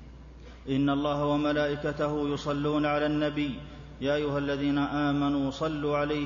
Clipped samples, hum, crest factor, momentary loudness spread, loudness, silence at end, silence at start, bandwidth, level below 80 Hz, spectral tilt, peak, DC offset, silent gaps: under 0.1%; none; 14 dB; 8 LU; -28 LUFS; 0 s; 0 s; 7.4 kHz; -48 dBFS; -7 dB/octave; -14 dBFS; under 0.1%; none